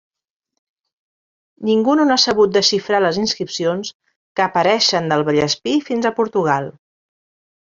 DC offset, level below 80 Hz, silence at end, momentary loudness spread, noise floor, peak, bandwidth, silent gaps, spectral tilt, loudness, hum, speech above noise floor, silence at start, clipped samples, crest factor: under 0.1%; -58 dBFS; 0.95 s; 8 LU; under -90 dBFS; -2 dBFS; 7.6 kHz; 3.94-4.00 s, 4.16-4.35 s; -4 dB/octave; -17 LUFS; none; over 73 dB; 1.6 s; under 0.1%; 18 dB